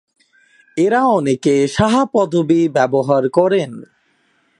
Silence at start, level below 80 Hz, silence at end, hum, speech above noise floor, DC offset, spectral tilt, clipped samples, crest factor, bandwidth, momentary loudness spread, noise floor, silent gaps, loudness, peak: 0.75 s; -48 dBFS; 0.75 s; none; 46 dB; under 0.1%; -6 dB/octave; under 0.1%; 16 dB; 11.5 kHz; 5 LU; -60 dBFS; none; -15 LUFS; 0 dBFS